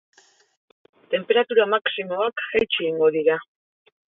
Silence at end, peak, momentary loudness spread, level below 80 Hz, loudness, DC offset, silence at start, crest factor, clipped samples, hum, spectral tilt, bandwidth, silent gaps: 0.7 s; -6 dBFS; 7 LU; -64 dBFS; -22 LUFS; under 0.1%; 1.1 s; 18 dB; under 0.1%; none; -5.5 dB/octave; 4 kHz; none